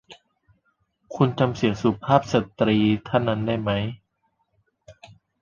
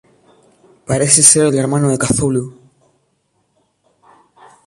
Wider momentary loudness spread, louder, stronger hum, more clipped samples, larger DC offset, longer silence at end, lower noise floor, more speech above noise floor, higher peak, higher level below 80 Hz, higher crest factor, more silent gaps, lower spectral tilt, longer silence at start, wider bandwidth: second, 7 LU vs 14 LU; second, -23 LUFS vs -12 LUFS; neither; second, under 0.1% vs 0.1%; neither; second, 0.5 s vs 2.15 s; first, -72 dBFS vs -64 dBFS; about the same, 50 dB vs 51 dB; about the same, -2 dBFS vs 0 dBFS; second, -52 dBFS vs -46 dBFS; about the same, 22 dB vs 18 dB; neither; first, -7 dB/octave vs -4 dB/octave; second, 0.1 s vs 0.9 s; second, 7.2 kHz vs 16 kHz